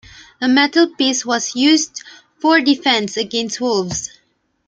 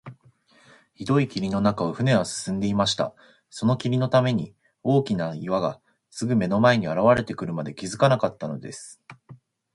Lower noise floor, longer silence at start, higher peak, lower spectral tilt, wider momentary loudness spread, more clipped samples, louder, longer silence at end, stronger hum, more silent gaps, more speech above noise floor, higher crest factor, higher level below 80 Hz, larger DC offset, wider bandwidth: first, -62 dBFS vs -58 dBFS; first, 0.4 s vs 0.05 s; about the same, -2 dBFS vs -4 dBFS; second, -2.5 dB/octave vs -6 dB/octave; second, 10 LU vs 15 LU; neither; first, -16 LUFS vs -24 LUFS; first, 0.6 s vs 0.4 s; neither; neither; first, 46 dB vs 35 dB; about the same, 16 dB vs 20 dB; about the same, -56 dBFS vs -56 dBFS; neither; second, 9.4 kHz vs 11.5 kHz